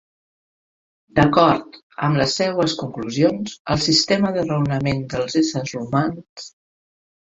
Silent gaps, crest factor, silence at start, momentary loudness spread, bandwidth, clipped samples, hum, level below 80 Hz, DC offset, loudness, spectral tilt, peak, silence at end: 1.83-1.90 s, 3.59-3.65 s, 6.29-6.36 s; 20 dB; 1.15 s; 11 LU; 7.8 kHz; under 0.1%; none; -48 dBFS; under 0.1%; -20 LUFS; -5 dB/octave; 0 dBFS; 0.8 s